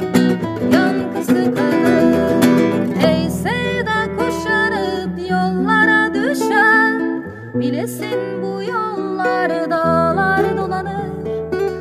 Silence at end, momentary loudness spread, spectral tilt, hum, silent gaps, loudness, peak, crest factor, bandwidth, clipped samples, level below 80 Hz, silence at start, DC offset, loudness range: 0 s; 9 LU; -6 dB/octave; none; none; -17 LUFS; 0 dBFS; 16 dB; 15.5 kHz; under 0.1%; -44 dBFS; 0 s; under 0.1%; 3 LU